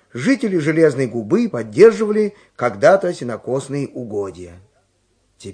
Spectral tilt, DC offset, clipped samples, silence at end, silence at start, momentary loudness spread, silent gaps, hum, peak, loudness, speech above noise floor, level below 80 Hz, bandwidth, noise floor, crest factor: -6.5 dB/octave; under 0.1%; under 0.1%; 0 s; 0.15 s; 14 LU; none; none; 0 dBFS; -17 LUFS; 46 dB; -60 dBFS; 10 kHz; -63 dBFS; 18 dB